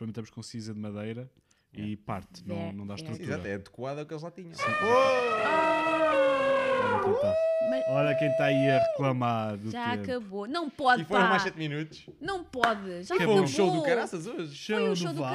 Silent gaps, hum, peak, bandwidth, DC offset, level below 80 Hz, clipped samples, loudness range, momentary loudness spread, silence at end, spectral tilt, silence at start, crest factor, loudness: none; none; -4 dBFS; 14 kHz; under 0.1%; -64 dBFS; under 0.1%; 12 LU; 15 LU; 0 s; -5.5 dB/octave; 0 s; 24 dB; -28 LUFS